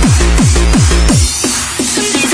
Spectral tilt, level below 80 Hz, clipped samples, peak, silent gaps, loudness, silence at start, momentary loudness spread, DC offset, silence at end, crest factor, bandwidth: -4 dB/octave; -14 dBFS; under 0.1%; 0 dBFS; none; -10 LUFS; 0 s; 3 LU; under 0.1%; 0 s; 10 dB; 11 kHz